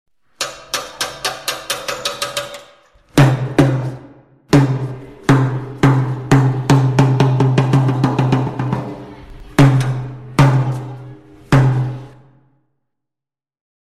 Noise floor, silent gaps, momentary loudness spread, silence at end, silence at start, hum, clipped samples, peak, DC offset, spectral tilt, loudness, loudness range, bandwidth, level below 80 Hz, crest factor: -88 dBFS; none; 13 LU; 1.75 s; 0.4 s; none; under 0.1%; -2 dBFS; under 0.1%; -6 dB/octave; -16 LUFS; 4 LU; 14 kHz; -42 dBFS; 16 dB